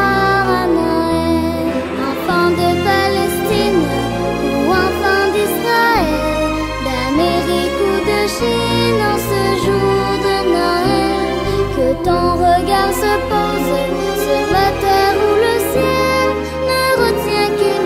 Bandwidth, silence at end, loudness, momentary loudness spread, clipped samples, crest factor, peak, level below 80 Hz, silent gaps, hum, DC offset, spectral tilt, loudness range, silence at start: 16 kHz; 0 s; -15 LUFS; 4 LU; under 0.1%; 12 dB; -2 dBFS; -32 dBFS; none; none; under 0.1%; -5 dB/octave; 1 LU; 0 s